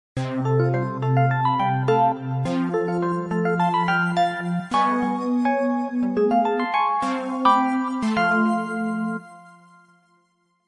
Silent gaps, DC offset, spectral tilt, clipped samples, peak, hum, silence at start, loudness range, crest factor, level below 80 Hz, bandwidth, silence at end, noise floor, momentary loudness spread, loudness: none; under 0.1%; -7.5 dB/octave; under 0.1%; -4 dBFS; none; 0.15 s; 2 LU; 18 dB; -60 dBFS; 11 kHz; 1.2 s; -66 dBFS; 6 LU; -22 LUFS